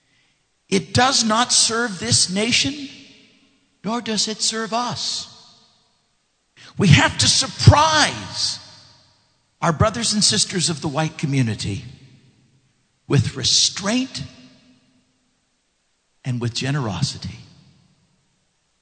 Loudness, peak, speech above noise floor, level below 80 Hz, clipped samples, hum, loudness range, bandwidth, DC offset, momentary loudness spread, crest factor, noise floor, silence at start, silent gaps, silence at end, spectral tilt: -18 LUFS; 0 dBFS; 49 dB; -44 dBFS; under 0.1%; none; 11 LU; 9.4 kHz; under 0.1%; 16 LU; 22 dB; -68 dBFS; 0.7 s; none; 1.4 s; -3.5 dB/octave